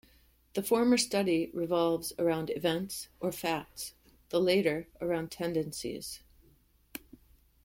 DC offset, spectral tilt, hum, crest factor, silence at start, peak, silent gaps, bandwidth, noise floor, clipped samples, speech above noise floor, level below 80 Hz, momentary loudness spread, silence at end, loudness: under 0.1%; -4.5 dB/octave; none; 18 dB; 0.55 s; -16 dBFS; none; 16.5 kHz; -65 dBFS; under 0.1%; 34 dB; -62 dBFS; 16 LU; 0.65 s; -31 LUFS